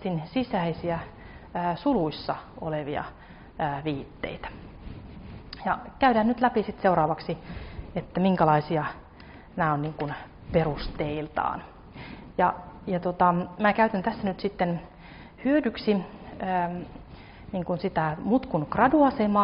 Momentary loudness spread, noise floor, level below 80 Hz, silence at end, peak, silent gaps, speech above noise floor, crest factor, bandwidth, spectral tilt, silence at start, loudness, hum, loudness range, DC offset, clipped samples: 21 LU; -47 dBFS; -48 dBFS; 0 s; -8 dBFS; none; 21 dB; 20 dB; 5.4 kHz; -5.5 dB/octave; 0 s; -27 LUFS; none; 5 LU; under 0.1%; under 0.1%